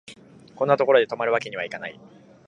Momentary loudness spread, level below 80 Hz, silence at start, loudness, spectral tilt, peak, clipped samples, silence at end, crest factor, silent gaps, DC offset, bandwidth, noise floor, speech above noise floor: 15 LU; -72 dBFS; 0.1 s; -22 LUFS; -5.5 dB/octave; -2 dBFS; under 0.1%; 0.55 s; 22 dB; none; under 0.1%; 10 kHz; -48 dBFS; 25 dB